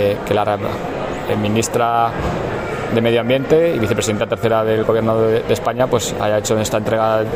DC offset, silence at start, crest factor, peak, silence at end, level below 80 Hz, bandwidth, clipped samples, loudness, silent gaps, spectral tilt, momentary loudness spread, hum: under 0.1%; 0 s; 14 dB; -2 dBFS; 0 s; -40 dBFS; 16 kHz; under 0.1%; -17 LUFS; none; -5 dB/octave; 6 LU; none